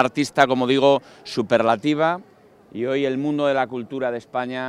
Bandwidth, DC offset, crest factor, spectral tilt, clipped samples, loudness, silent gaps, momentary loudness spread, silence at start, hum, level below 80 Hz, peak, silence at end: 13 kHz; under 0.1%; 20 dB; -5.5 dB/octave; under 0.1%; -21 LUFS; none; 10 LU; 0 s; none; -64 dBFS; 0 dBFS; 0 s